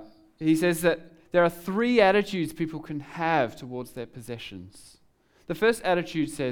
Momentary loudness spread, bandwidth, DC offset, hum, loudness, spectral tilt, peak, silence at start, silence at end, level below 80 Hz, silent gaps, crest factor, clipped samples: 17 LU; over 20 kHz; under 0.1%; none; -25 LUFS; -5.5 dB/octave; -8 dBFS; 0 s; 0 s; -58 dBFS; none; 20 dB; under 0.1%